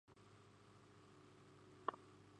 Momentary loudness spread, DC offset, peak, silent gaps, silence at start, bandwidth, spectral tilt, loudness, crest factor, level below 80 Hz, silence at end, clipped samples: 17 LU; under 0.1%; -26 dBFS; none; 0.05 s; 10.5 kHz; -5.5 dB/octave; -55 LUFS; 30 dB; -84 dBFS; 0 s; under 0.1%